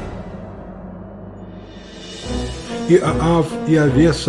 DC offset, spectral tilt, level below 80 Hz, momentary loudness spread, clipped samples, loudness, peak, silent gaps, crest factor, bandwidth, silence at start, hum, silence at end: under 0.1%; -6.5 dB/octave; -34 dBFS; 21 LU; under 0.1%; -17 LUFS; -2 dBFS; none; 18 dB; 11.5 kHz; 0 s; none; 0 s